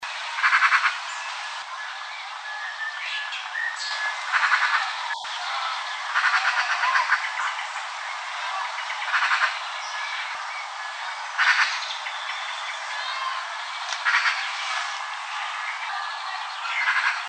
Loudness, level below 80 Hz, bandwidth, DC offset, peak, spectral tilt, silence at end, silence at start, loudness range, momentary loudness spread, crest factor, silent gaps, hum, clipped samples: -25 LUFS; under -90 dBFS; 9.4 kHz; under 0.1%; -6 dBFS; 6 dB/octave; 0 s; 0 s; 3 LU; 11 LU; 22 dB; none; none; under 0.1%